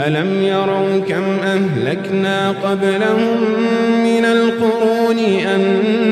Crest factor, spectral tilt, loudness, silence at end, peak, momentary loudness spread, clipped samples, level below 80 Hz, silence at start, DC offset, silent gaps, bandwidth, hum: 12 dB; -6.5 dB/octave; -15 LUFS; 0 s; -4 dBFS; 3 LU; under 0.1%; -60 dBFS; 0 s; under 0.1%; none; 13.5 kHz; none